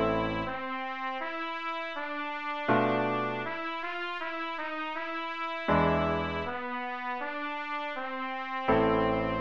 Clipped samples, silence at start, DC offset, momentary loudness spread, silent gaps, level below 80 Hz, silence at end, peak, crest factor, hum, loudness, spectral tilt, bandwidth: under 0.1%; 0 s; 0.4%; 8 LU; none; -52 dBFS; 0 s; -12 dBFS; 18 dB; none; -31 LUFS; -7 dB/octave; 7.6 kHz